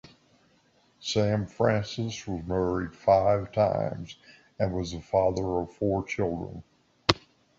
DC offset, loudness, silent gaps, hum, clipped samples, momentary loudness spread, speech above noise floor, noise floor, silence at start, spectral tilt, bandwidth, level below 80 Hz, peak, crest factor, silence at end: under 0.1%; -28 LUFS; none; none; under 0.1%; 12 LU; 37 dB; -65 dBFS; 1 s; -6 dB/octave; 7.8 kHz; -50 dBFS; -2 dBFS; 26 dB; 0.4 s